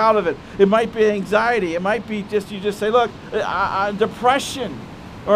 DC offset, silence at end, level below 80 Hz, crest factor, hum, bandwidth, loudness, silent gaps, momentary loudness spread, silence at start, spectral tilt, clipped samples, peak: under 0.1%; 0 s; -48 dBFS; 18 dB; none; 15 kHz; -20 LUFS; none; 9 LU; 0 s; -5 dB/octave; under 0.1%; -2 dBFS